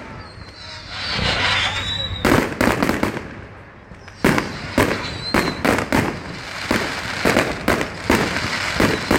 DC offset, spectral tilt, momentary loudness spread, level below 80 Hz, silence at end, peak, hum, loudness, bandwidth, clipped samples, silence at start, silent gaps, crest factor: under 0.1%; -4.5 dB/octave; 17 LU; -36 dBFS; 0 s; 0 dBFS; none; -20 LUFS; 17 kHz; under 0.1%; 0 s; none; 20 dB